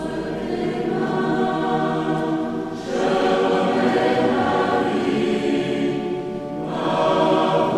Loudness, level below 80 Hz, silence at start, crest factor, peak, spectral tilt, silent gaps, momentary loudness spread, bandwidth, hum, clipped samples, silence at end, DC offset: -21 LUFS; -52 dBFS; 0 s; 14 dB; -6 dBFS; -6.5 dB/octave; none; 8 LU; 12 kHz; none; under 0.1%; 0 s; 0.1%